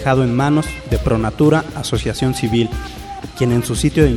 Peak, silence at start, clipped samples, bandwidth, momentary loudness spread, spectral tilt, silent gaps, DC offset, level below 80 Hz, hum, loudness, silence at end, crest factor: 0 dBFS; 0 s; under 0.1%; 16.5 kHz; 9 LU; -6 dB/octave; none; under 0.1%; -28 dBFS; none; -17 LUFS; 0 s; 16 dB